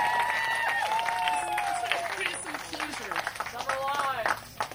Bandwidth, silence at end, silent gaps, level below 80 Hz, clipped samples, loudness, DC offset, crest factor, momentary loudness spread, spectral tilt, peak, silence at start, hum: 16.5 kHz; 0 s; none; -62 dBFS; under 0.1%; -29 LUFS; under 0.1%; 20 dB; 7 LU; -1.5 dB/octave; -10 dBFS; 0 s; none